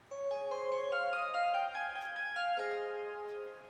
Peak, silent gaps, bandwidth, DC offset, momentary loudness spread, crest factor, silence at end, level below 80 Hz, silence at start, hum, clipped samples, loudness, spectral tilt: -24 dBFS; none; 10.5 kHz; under 0.1%; 7 LU; 14 dB; 0 s; -80 dBFS; 0.1 s; none; under 0.1%; -37 LUFS; -2 dB/octave